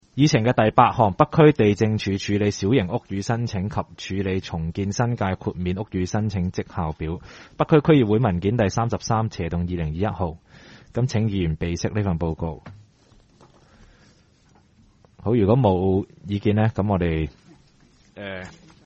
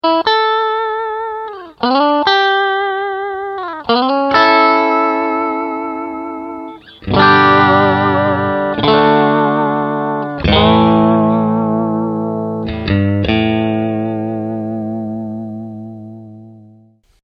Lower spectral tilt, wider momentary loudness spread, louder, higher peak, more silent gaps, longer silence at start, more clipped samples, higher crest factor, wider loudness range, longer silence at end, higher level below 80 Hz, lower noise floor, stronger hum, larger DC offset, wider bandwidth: about the same, -7 dB/octave vs -7.5 dB/octave; about the same, 13 LU vs 15 LU; second, -22 LUFS vs -14 LUFS; about the same, 0 dBFS vs 0 dBFS; neither; about the same, 0.15 s vs 0.05 s; neither; first, 22 dB vs 14 dB; about the same, 7 LU vs 6 LU; second, 0.35 s vs 0.65 s; about the same, -42 dBFS vs -38 dBFS; first, -57 dBFS vs -48 dBFS; neither; neither; first, 8 kHz vs 6.2 kHz